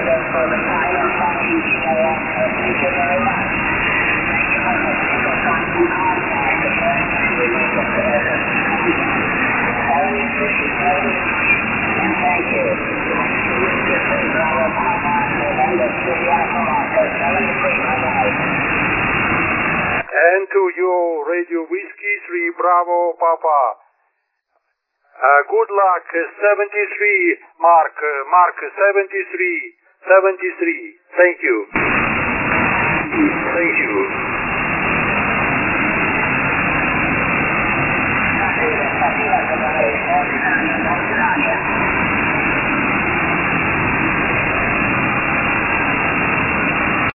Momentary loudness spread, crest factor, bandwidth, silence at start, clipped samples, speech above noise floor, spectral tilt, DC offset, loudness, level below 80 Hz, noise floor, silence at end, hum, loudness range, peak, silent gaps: 4 LU; 16 dB; 3 kHz; 0 s; under 0.1%; 53 dB; -9 dB/octave; under 0.1%; -16 LUFS; -40 dBFS; -69 dBFS; 0.05 s; none; 2 LU; 0 dBFS; none